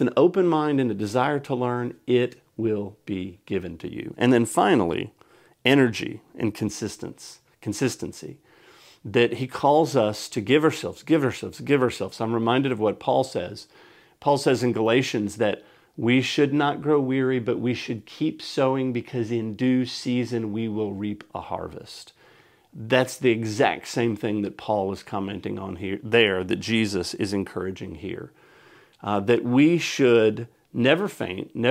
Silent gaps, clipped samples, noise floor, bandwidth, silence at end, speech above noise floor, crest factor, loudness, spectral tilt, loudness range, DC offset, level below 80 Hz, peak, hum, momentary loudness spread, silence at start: none; under 0.1%; -56 dBFS; 16 kHz; 0 s; 32 dB; 22 dB; -24 LUFS; -5.5 dB/octave; 5 LU; under 0.1%; -62 dBFS; -2 dBFS; none; 15 LU; 0 s